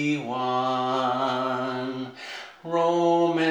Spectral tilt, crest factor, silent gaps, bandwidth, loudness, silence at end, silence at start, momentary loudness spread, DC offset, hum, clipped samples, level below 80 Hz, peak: -5.5 dB/octave; 14 dB; none; 9.8 kHz; -25 LUFS; 0 s; 0 s; 14 LU; under 0.1%; none; under 0.1%; -76 dBFS; -10 dBFS